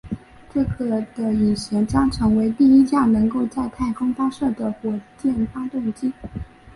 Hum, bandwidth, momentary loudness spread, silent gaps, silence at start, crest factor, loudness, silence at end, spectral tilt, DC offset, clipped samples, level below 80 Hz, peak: none; 11.5 kHz; 13 LU; none; 0.05 s; 14 dB; -21 LUFS; 0.05 s; -7 dB/octave; under 0.1%; under 0.1%; -40 dBFS; -6 dBFS